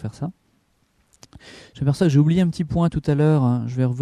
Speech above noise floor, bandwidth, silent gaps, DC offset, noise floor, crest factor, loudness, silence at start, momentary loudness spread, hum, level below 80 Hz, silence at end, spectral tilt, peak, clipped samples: 44 dB; 10.5 kHz; none; under 0.1%; -64 dBFS; 16 dB; -20 LUFS; 0 s; 12 LU; none; -46 dBFS; 0 s; -8.5 dB/octave; -6 dBFS; under 0.1%